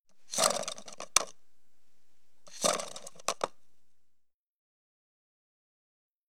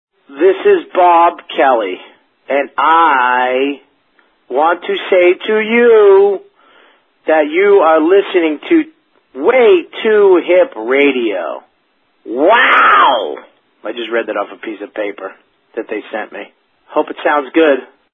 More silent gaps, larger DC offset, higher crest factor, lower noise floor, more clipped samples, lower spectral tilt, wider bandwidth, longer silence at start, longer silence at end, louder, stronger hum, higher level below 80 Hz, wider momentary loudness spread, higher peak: first, 0.00-0.05 s vs none; first, 0.5% vs under 0.1%; first, 34 dB vs 12 dB; first, -77 dBFS vs -60 dBFS; neither; second, 0 dB/octave vs -6.5 dB/octave; first, over 20 kHz vs 4 kHz; second, 0 s vs 0.3 s; second, 0.05 s vs 0.3 s; second, -31 LUFS vs -12 LUFS; neither; second, -72 dBFS vs -62 dBFS; about the same, 15 LU vs 16 LU; second, -4 dBFS vs 0 dBFS